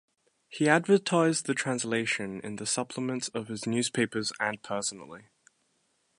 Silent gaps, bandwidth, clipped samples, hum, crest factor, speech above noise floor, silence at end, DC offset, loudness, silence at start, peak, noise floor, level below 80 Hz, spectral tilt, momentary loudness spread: none; 11.5 kHz; under 0.1%; none; 24 dB; 44 dB; 1 s; under 0.1%; -29 LUFS; 0.5 s; -6 dBFS; -73 dBFS; -72 dBFS; -4 dB/octave; 11 LU